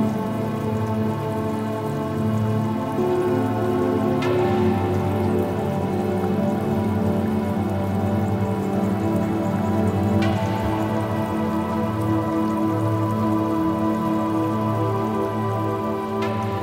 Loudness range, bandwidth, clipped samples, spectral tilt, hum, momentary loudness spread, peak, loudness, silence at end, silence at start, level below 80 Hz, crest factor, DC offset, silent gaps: 1 LU; 16.5 kHz; under 0.1%; -8 dB/octave; none; 4 LU; -8 dBFS; -23 LUFS; 0 s; 0 s; -50 dBFS; 14 dB; under 0.1%; none